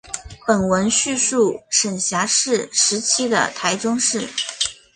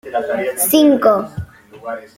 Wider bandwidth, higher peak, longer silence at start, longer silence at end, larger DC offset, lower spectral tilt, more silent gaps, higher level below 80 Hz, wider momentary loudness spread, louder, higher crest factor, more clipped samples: second, 11 kHz vs 16.5 kHz; about the same, -2 dBFS vs -2 dBFS; about the same, 0.05 s vs 0.05 s; about the same, 0.2 s vs 0.15 s; neither; second, -2 dB/octave vs -4 dB/octave; neither; about the same, -52 dBFS vs -48 dBFS; second, 6 LU vs 21 LU; second, -18 LUFS vs -14 LUFS; about the same, 18 dB vs 16 dB; neither